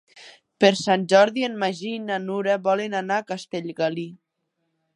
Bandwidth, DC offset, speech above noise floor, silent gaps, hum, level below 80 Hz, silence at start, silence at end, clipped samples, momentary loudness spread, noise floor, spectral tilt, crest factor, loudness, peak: 11 kHz; under 0.1%; 54 dB; none; none; -74 dBFS; 0.15 s; 0.8 s; under 0.1%; 13 LU; -76 dBFS; -4.5 dB/octave; 22 dB; -23 LUFS; -2 dBFS